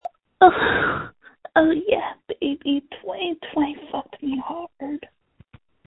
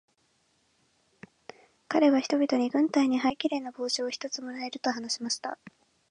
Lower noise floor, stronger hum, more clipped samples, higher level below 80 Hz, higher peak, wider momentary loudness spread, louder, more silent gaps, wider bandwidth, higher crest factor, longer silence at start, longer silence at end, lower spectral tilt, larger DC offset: second, -54 dBFS vs -71 dBFS; neither; neither; first, -54 dBFS vs -74 dBFS; first, 0 dBFS vs -10 dBFS; first, 17 LU vs 13 LU; first, -22 LUFS vs -28 LUFS; neither; second, 4.1 kHz vs 10.5 kHz; about the same, 22 dB vs 20 dB; second, 0.05 s vs 1.9 s; first, 0.9 s vs 0.4 s; first, -8.5 dB/octave vs -2.5 dB/octave; neither